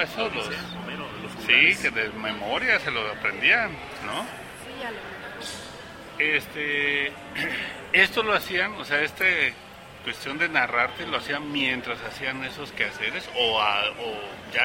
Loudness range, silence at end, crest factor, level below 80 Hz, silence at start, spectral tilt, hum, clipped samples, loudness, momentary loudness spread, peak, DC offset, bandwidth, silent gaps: 5 LU; 0 s; 22 dB; -56 dBFS; 0 s; -3 dB/octave; none; under 0.1%; -24 LUFS; 16 LU; -4 dBFS; under 0.1%; 16 kHz; none